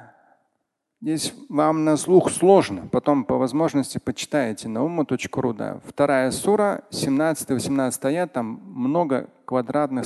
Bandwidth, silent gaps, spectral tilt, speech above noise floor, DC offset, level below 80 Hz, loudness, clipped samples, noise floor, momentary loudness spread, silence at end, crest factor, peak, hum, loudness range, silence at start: 12.5 kHz; none; -5.5 dB/octave; 55 dB; under 0.1%; -58 dBFS; -22 LUFS; under 0.1%; -76 dBFS; 10 LU; 0 s; 20 dB; -2 dBFS; none; 4 LU; 0 s